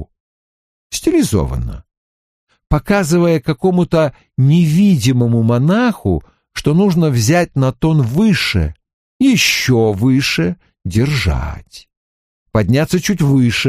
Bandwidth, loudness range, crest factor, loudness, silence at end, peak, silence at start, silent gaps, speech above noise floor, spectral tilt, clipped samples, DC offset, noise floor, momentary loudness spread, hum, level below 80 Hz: 15.5 kHz; 4 LU; 14 dB; -14 LUFS; 0 s; 0 dBFS; 0 s; 0.20-0.90 s, 1.97-2.47 s, 8.93-9.20 s, 11.97-12.46 s; over 77 dB; -6 dB/octave; under 0.1%; under 0.1%; under -90 dBFS; 9 LU; none; -32 dBFS